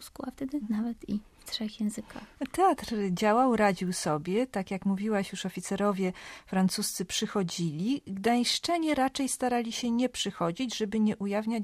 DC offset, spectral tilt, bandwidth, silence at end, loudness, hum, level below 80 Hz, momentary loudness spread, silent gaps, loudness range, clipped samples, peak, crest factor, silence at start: under 0.1%; -4.5 dB/octave; 15 kHz; 0 s; -30 LUFS; none; -60 dBFS; 9 LU; none; 2 LU; under 0.1%; -12 dBFS; 16 dB; 0 s